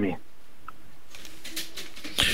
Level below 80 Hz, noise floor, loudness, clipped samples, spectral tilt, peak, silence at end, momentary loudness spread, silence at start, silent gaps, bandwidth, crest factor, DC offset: -48 dBFS; -54 dBFS; -33 LUFS; under 0.1%; -2.5 dB/octave; -6 dBFS; 0 s; 17 LU; 0 s; none; 16 kHz; 28 dB; 3%